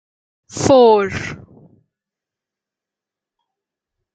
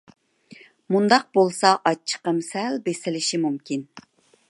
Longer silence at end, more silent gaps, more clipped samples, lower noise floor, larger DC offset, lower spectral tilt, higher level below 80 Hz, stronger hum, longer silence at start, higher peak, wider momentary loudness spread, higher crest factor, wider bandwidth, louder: first, 2.8 s vs 0.5 s; neither; neither; first, -87 dBFS vs -50 dBFS; neither; about the same, -5 dB/octave vs -4 dB/octave; first, -54 dBFS vs -76 dBFS; neither; about the same, 0.55 s vs 0.5 s; about the same, -2 dBFS vs -2 dBFS; first, 19 LU vs 9 LU; about the same, 18 dB vs 22 dB; second, 9.2 kHz vs 11.5 kHz; first, -13 LUFS vs -22 LUFS